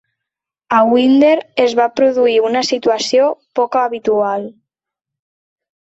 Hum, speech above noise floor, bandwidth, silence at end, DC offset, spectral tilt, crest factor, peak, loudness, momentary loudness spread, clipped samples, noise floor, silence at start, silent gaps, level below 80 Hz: none; 70 dB; 8.2 kHz; 1.35 s; under 0.1%; -4 dB/octave; 14 dB; -2 dBFS; -14 LUFS; 6 LU; under 0.1%; -83 dBFS; 0.7 s; none; -62 dBFS